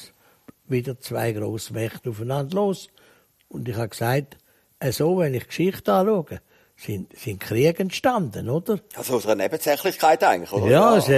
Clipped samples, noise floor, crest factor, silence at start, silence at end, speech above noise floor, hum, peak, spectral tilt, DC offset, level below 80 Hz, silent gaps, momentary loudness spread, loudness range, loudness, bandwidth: under 0.1%; -52 dBFS; 18 dB; 0 s; 0 s; 30 dB; none; -4 dBFS; -5.5 dB/octave; under 0.1%; -58 dBFS; none; 14 LU; 6 LU; -23 LUFS; 15.5 kHz